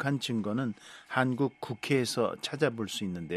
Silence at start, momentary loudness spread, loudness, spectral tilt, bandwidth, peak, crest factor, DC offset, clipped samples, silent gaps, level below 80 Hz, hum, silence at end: 0 s; 7 LU; -31 LUFS; -5 dB/octave; 13.5 kHz; -10 dBFS; 20 dB; under 0.1%; under 0.1%; none; -70 dBFS; none; 0 s